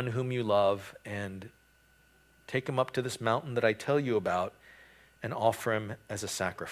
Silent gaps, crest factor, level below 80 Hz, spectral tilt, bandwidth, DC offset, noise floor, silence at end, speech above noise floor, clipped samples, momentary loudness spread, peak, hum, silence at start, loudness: none; 20 dB; -62 dBFS; -5 dB/octave; 16 kHz; under 0.1%; -64 dBFS; 0 s; 33 dB; under 0.1%; 11 LU; -12 dBFS; none; 0 s; -32 LUFS